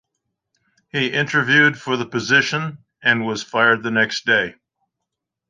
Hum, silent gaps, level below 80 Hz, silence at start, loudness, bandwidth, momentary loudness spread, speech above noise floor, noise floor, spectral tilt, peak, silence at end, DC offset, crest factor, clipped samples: none; none; -64 dBFS; 0.95 s; -18 LUFS; 9.6 kHz; 10 LU; 63 dB; -81 dBFS; -4 dB/octave; -2 dBFS; 1 s; under 0.1%; 18 dB; under 0.1%